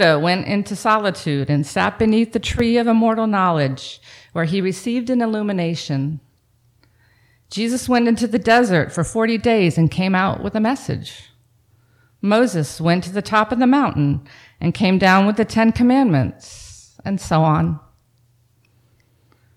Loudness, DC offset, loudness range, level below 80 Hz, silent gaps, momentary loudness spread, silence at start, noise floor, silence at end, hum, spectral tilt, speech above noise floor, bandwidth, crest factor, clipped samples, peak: -18 LUFS; under 0.1%; 6 LU; -44 dBFS; none; 12 LU; 0 s; -59 dBFS; 1.8 s; none; -6 dB/octave; 42 dB; 14 kHz; 16 dB; under 0.1%; -4 dBFS